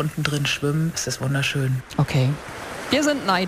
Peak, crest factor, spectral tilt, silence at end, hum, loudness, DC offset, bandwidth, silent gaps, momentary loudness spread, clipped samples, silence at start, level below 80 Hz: -4 dBFS; 20 dB; -5 dB/octave; 0 s; none; -23 LUFS; under 0.1%; 15.5 kHz; none; 5 LU; under 0.1%; 0 s; -48 dBFS